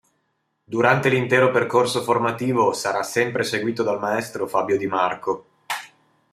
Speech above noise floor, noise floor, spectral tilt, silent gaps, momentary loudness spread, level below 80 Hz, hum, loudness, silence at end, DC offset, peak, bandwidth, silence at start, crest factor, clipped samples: 51 dB; -72 dBFS; -5 dB/octave; none; 12 LU; -66 dBFS; none; -21 LUFS; 0.45 s; under 0.1%; -2 dBFS; 15 kHz; 0.7 s; 20 dB; under 0.1%